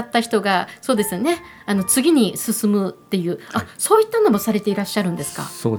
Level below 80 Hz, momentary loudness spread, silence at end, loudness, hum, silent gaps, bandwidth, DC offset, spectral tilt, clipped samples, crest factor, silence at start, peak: -58 dBFS; 9 LU; 0 s; -19 LUFS; none; none; over 20 kHz; under 0.1%; -4.5 dB/octave; under 0.1%; 18 dB; 0 s; -2 dBFS